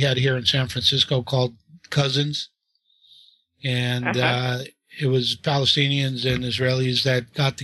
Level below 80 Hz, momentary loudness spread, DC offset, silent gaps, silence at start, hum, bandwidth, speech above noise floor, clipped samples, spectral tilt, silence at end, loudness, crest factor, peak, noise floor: -52 dBFS; 9 LU; under 0.1%; none; 0 s; none; 12.5 kHz; 45 dB; under 0.1%; -5 dB/octave; 0 s; -22 LUFS; 18 dB; -4 dBFS; -66 dBFS